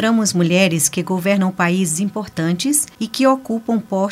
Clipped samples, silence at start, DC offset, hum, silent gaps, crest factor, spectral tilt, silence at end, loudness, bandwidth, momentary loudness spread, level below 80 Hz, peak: under 0.1%; 0 s; under 0.1%; none; none; 16 dB; -4.5 dB/octave; 0 s; -17 LUFS; 16 kHz; 6 LU; -58 dBFS; 0 dBFS